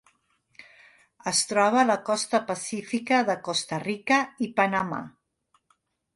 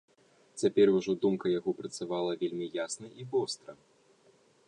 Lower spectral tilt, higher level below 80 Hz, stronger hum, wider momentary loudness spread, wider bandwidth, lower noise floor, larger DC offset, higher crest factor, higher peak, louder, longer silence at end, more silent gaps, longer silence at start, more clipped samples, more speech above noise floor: second, -3 dB/octave vs -5 dB/octave; about the same, -70 dBFS vs -74 dBFS; neither; second, 10 LU vs 13 LU; about the same, 11.5 kHz vs 10.5 kHz; first, -70 dBFS vs -65 dBFS; neither; about the same, 20 dB vs 18 dB; first, -8 dBFS vs -14 dBFS; first, -25 LUFS vs -31 LUFS; about the same, 1.05 s vs 0.95 s; neither; about the same, 0.6 s vs 0.55 s; neither; first, 45 dB vs 34 dB